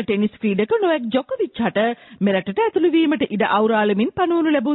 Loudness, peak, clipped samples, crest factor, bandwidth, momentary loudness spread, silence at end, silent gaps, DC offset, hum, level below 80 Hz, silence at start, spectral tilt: -19 LUFS; -6 dBFS; under 0.1%; 12 dB; 4.1 kHz; 5 LU; 0 s; none; under 0.1%; none; -58 dBFS; 0 s; -11 dB/octave